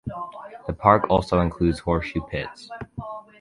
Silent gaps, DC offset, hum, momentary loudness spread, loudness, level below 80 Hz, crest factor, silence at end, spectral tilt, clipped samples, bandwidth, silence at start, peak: none; under 0.1%; none; 18 LU; -22 LUFS; -40 dBFS; 22 dB; 0.2 s; -7.5 dB/octave; under 0.1%; 11.5 kHz; 0.05 s; -2 dBFS